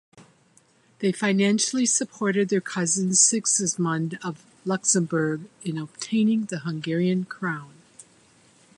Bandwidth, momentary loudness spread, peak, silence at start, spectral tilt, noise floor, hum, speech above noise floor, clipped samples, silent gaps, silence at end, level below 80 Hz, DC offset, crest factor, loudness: 11.5 kHz; 13 LU; -4 dBFS; 0.15 s; -3.5 dB/octave; -60 dBFS; none; 36 dB; under 0.1%; none; 0.75 s; -72 dBFS; under 0.1%; 20 dB; -23 LUFS